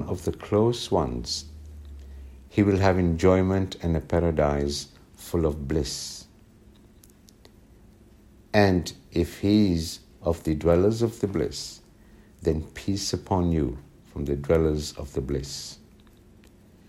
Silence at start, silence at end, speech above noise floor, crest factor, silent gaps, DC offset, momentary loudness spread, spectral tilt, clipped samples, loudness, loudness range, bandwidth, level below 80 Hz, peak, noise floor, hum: 0 s; 1.15 s; 29 dB; 20 dB; none; under 0.1%; 20 LU; -6 dB/octave; under 0.1%; -26 LUFS; 6 LU; 16 kHz; -40 dBFS; -6 dBFS; -53 dBFS; none